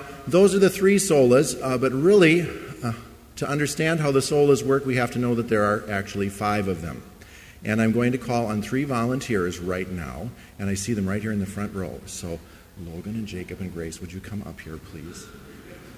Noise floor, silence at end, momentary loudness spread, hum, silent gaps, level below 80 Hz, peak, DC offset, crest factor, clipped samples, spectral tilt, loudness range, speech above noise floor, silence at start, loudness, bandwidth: -46 dBFS; 0 s; 20 LU; none; none; -48 dBFS; -4 dBFS; under 0.1%; 18 dB; under 0.1%; -5.5 dB/octave; 13 LU; 23 dB; 0 s; -23 LUFS; 16 kHz